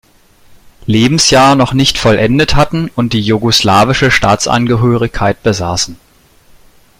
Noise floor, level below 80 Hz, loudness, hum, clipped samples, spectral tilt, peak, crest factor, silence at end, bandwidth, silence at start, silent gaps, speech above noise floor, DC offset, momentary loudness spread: -46 dBFS; -30 dBFS; -10 LUFS; none; under 0.1%; -4.5 dB/octave; 0 dBFS; 12 dB; 1.05 s; 16 kHz; 0.85 s; none; 36 dB; under 0.1%; 7 LU